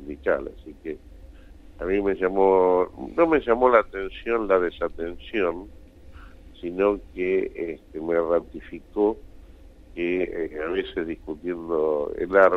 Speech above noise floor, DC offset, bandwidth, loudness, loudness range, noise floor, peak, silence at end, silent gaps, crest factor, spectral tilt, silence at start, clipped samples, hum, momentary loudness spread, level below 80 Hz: 23 dB; under 0.1%; 6 kHz; -24 LUFS; 7 LU; -47 dBFS; -4 dBFS; 0 s; none; 22 dB; -7.5 dB/octave; 0 s; under 0.1%; none; 18 LU; -46 dBFS